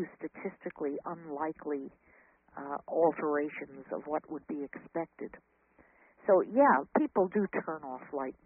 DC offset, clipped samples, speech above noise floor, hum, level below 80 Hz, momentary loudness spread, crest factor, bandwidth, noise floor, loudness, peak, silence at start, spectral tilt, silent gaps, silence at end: under 0.1%; under 0.1%; 32 dB; none; -74 dBFS; 15 LU; 20 dB; 3.2 kHz; -64 dBFS; -33 LUFS; -14 dBFS; 0 s; -1.5 dB/octave; none; 0.15 s